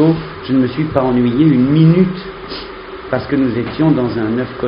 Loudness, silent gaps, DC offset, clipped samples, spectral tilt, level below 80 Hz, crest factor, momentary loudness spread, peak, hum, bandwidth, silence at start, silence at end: -14 LUFS; none; under 0.1%; under 0.1%; -7.5 dB/octave; -40 dBFS; 14 dB; 16 LU; 0 dBFS; none; 5.4 kHz; 0 s; 0 s